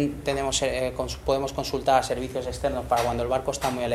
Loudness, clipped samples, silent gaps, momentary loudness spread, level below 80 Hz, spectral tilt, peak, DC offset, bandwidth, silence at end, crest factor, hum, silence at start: -26 LUFS; under 0.1%; none; 6 LU; -42 dBFS; -4 dB/octave; -6 dBFS; under 0.1%; 16 kHz; 0 s; 20 dB; none; 0 s